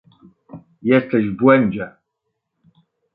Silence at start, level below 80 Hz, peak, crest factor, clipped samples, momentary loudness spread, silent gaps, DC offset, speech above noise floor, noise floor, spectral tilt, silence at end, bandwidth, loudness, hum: 0.55 s; -58 dBFS; -2 dBFS; 18 dB; under 0.1%; 14 LU; none; under 0.1%; 61 dB; -76 dBFS; -11.5 dB/octave; 1.25 s; 4.7 kHz; -17 LUFS; none